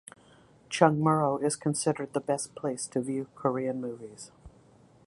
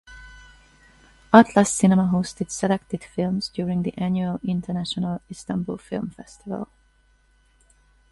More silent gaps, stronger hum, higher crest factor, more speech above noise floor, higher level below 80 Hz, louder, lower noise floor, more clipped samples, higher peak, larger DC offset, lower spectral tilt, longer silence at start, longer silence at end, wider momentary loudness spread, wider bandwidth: neither; neither; about the same, 26 dB vs 24 dB; second, 30 dB vs 38 dB; second, -66 dBFS vs -54 dBFS; second, -29 LUFS vs -23 LUFS; about the same, -58 dBFS vs -60 dBFS; neither; second, -4 dBFS vs 0 dBFS; neither; about the same, -5.5 dB/octave vs -5.5 dB/octave; first, 0.7 s vs 0.1 s; second, 0.6 s vs 1.45 s; about the same, 15 LU vs 17 LU; about the same, 11.5 kHz vs 11.5 kHz